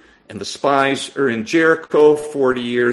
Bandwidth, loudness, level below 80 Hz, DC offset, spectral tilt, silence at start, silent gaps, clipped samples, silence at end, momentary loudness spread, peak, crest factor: 12 kHz; -16 LUFS; -58 dBFS; under 0.1%; -4.5 dB/octave; 0.3 s; none; under 0.1%; 0 s; 12 LU; 0 dBFS; 16 dB